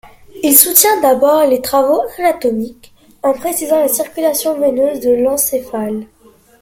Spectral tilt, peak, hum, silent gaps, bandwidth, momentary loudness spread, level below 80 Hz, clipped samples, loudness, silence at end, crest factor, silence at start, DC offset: -2.5 dB/octave; 0 dBFS; none; none; 17 kHz; 12 LU; -50 dBFS; 0.2%; -13 LUFS; 0.55 s; 14 dB; 0.05 s; under 0.1%